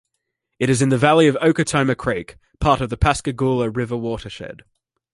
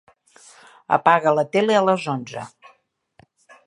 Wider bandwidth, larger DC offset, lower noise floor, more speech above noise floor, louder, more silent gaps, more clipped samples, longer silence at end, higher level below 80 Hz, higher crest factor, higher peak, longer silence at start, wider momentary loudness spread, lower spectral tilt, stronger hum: about the same, 11.5 kHz vs 11 kHz; neither; first, -76 dBFS vs -60 dBFS; first, 58 dB vs 41 dB; about the same, -19 LUFS vs -19 LUFS; neither; neither; second, 0.6 s vs 1.2 s; first, -36 dBFS vs -70 dBFS; about the same, 18 dB vs 20 dB; about the same, -2 dBFS vs -2 dBFS; second, 0.6 s vs 0.9 s; second, 13 LU vs 18 LU; about the same, -5.5 dB/octave vs -5.5 dB/octave; neither